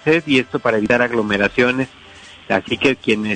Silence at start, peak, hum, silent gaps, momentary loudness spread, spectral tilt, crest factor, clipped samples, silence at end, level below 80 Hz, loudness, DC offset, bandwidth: 0.05 s; -4 dBFS; none; none; 6 LU; -5.5 dB/octave; 14 dB; under 0.1%; 0 s; -50 dBFS; -17 LUFS; under 0.1%; 9.4 kHz